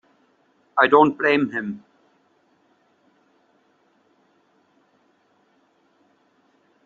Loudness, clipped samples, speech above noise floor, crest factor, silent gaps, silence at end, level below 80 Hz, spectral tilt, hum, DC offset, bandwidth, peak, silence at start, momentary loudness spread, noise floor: -19 LUFS; under 0.1%; 45 dB; 24 dB; none; 5.05 s; -72 dBFS; -3 dB/octave; none; under 0.1%; 7 kHz; -2 dBFS; 0.75 s; 17 LU; -63 dBFS